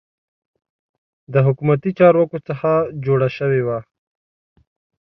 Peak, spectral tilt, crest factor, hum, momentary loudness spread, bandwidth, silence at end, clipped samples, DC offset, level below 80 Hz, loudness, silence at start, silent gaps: -2 dBFS; -10.5 dB/octave; 18 dB; none; 9 LU; 5.8 kHz; 1.3 s; under 0.1%; under 0.1%; -58 dBFS; -18 LUFS; 1.3 s; none